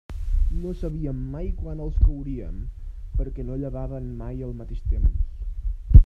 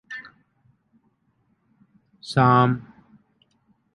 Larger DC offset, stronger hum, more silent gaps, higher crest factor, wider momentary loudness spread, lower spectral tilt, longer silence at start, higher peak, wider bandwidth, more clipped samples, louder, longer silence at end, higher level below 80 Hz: neither; neither; neither; about the same, 22 dB vs 22 dB; second, 10 LU vs 21 LU; first, -11 dB/octave vs -7.5 dB/octave; about the same, 0.1 s vs 0.1 s; first, 0 dBFS vs -4 dBFS; second, 2.5 kHz vs 11 kHz; neither; second, -29 LUFS vs -20 LUFS; second, 0 s vs 1.15 s; first, -24 dBFS vs -62 dBFS